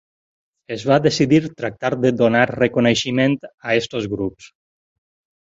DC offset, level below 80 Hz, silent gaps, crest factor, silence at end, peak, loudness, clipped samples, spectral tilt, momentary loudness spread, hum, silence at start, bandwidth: under 0.1%; -52 dBFS; 3.54-3.58 s; 18 dB; 1.05 s; -2 dBFS; -18 LUFS; under 0.1%; -5.5 dB/octave; 10 LU; none; 0.7 s; 8 kHz